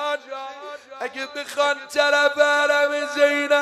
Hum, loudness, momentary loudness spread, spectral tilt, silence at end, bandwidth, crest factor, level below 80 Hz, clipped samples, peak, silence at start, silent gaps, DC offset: none; -20 LUFS; 16 LU; 0 dB/octave; 0 s; 13.5 kHz; 18 dB; -76 dBFS; under 0.1%; -4 dBFS; 0 s; none; under 0.1%